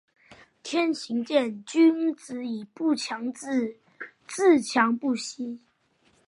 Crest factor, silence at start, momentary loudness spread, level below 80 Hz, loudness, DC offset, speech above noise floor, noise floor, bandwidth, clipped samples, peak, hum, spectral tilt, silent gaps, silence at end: 20 dB; 0.3 s; 16 LU; -78 dBFS; -26 LUFS; under 0.1%; 41 dB; -66 dBFS; 11.5 kHz; under 0.1%; -6 dBFS; none; -3.5 dB/octave; none; 0.7 s